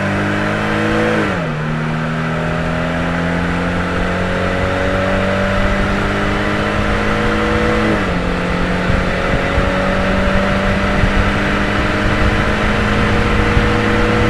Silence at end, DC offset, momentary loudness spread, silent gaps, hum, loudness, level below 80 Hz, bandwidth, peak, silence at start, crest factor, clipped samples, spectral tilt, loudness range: 0 s; under 0.1%; 3 LU; none; none; -16 LUFS; -24 dBFS; 13 kHz; 0 dBFS; 0 s; 14 dB; under 0.1%; -6 dB/octave; 2 LU